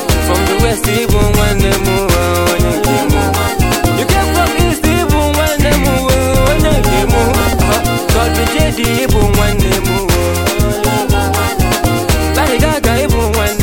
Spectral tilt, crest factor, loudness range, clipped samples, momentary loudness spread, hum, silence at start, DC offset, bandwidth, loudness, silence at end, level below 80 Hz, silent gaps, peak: -5 dB/octave; 12 dB; 1 LU; under 0.1%; 2 LU; none; 0 s; under 0.1%; 17 kHz; -12 LUFS; 0 s; -18 dBFS; none; 0 dBFS